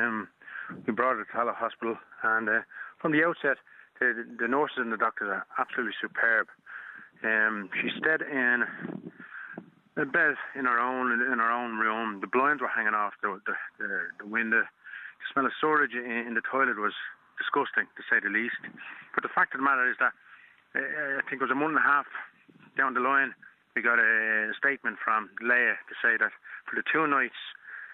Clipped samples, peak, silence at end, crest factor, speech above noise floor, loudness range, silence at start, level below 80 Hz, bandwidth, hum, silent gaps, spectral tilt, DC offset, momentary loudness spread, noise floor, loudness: under 0.1%; -10 dBFS; 0 s; 20 dB; 27 dB; 3 LU; 0 s; -80 dBFS; 4.2 kHz; none; none; -7 dB/octave; under 0.1%; 15 LU; -56 dBFS; -27 LUFS